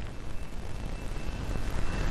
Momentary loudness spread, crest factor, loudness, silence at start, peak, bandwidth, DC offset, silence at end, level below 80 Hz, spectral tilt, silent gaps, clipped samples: 7 LU; 14 dB; -38 LUFS; 0 s; -16 dBFS; 13.5 kHz; under 0.1%; 0 s; -36 dBFS; -5.5 dB/octave; none; under 0.1%